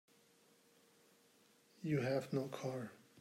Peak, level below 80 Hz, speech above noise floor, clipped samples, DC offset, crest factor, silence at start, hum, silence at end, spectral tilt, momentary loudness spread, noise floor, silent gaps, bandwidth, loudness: -26 dBFS; -82 dBFS; 31 dB; under 0.1%; under 0.1%; 18 dB; 1.8 s; none; 0 s; -7 dB/octave; 11 LU; -71 dBFS; none; 16 kHz; -42 LUFS